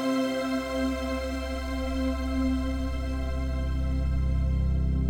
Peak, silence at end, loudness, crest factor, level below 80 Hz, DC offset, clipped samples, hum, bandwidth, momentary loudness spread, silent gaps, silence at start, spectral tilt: -16 dBFS; 0 s; -29 LUFS; 12 dB; -30 dBFS; under 0.1%; under 0.1%; none; 13.5 kHz; 4 LU; none; 0 s; -7 dB/octave